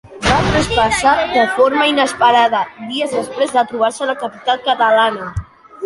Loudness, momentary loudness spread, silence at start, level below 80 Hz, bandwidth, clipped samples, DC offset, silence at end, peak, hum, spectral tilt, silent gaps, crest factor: -15 LUFS; 9 LU; 0.05 s; -36 dBFS; 11.5 kHz; under 0.1%; under 0.1%; 0 s; -2 dBFS; none; -4 dB/octave; none; 14 dB